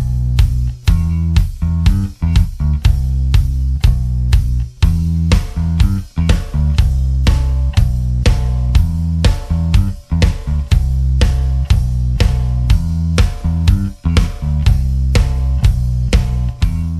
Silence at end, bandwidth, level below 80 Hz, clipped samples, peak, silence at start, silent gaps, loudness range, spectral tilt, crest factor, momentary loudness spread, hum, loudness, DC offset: 0 s; 13 kHz; -16 dBFS; under 0.1%; 0 dBFS; 0 s; none; 0 LU; -6.5 dB/octave; 12 dB; 3 LU; none; -16 LUFS; under 0.1%